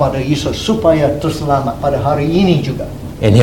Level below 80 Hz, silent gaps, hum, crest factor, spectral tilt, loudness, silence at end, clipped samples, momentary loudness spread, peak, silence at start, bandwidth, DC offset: -32 dBFS; none; none; 14 dB; -7 dB/octave; -15 LUFS; 0 s; under 0.1%; 6 LU; 0 dBFS; 0 s; 17.5 kHz; 0.8%